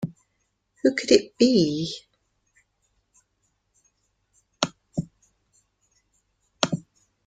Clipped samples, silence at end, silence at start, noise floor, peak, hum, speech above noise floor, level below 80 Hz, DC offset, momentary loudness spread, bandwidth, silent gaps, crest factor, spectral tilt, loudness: under 0.1%; 0.45 s; 0 s; -74 dBFS; -2 dBFS; none; 53 dB; -62 dBFS; under 0.1%; 15 LU; 9.4 kHz; none; 26 dB; -4.5 dB/octave; -24 LUFS